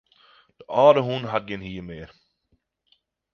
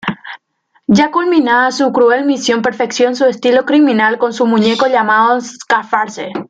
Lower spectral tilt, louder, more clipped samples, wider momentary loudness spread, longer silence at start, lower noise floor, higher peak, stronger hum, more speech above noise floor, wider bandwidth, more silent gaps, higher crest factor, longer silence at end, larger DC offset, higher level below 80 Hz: first, -7 dB/octave vs -4.5 dB/octave; second, -21 LUFS vs -12 LUFS; neither; first, 21 LU vs 7 LU; first, 0.7 s vs 0.05 s; first, -70 dBFS vs -58 dBFS; about the same, -4 dBFS vs -2 dBFS; neither; about the same, 49 dB vs 46 dB; second, 6.6 kHz vs 9 kHz; neither; first, 22 dB vs 12 dB; first, 1.25 s vs 0.05 s; neither; about the same, -58 dBFS vs -58 dBFS